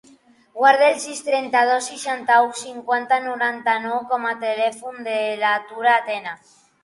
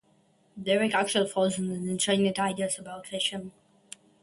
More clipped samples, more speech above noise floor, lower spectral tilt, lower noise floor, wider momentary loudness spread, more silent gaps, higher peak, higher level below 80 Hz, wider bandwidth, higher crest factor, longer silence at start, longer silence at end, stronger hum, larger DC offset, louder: neither; second, 33 dB vs 37 dB; second, -1.5 dB/octave vs -3.5 dB/octave; second, -53 dBFS vs -65 dBFS; second, 11 LU vs 19 LU; neither; first, -2 dBFS vs -10 dBFS; second, -76 dBFS vs -68 dBFS; about the same, 11.5 kHz vs 11.5 kHz; about the same, 20 dB vs 18 dB; about the same, 0.55 s vs 0.55 s; second, 0.5 s vs 0.7 s; neither; neither; first, -20 LUFS vs -28 LUFS